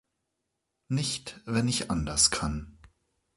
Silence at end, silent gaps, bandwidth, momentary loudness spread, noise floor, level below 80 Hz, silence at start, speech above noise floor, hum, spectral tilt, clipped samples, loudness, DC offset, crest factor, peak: 0.65 s; none; 11.5 kHz; 11 LU; -82 dBFS; -46 dBFS; 0.9 s; 53 dB; none; -3 dB/octave; under 0.1%; -28 LUFS; under 0.1%; 24 dB; -8 dBFS